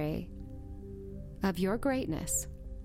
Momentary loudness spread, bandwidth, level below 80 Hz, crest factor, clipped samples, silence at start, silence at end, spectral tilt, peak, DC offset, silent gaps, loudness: 15 LU; 16.5 kHz; -46 dBFS; 16 dB; under 0.1%; 0 s; 0 s; -5 dB/octave; -18 dBFS; under 0.1%; none; -33 LUFS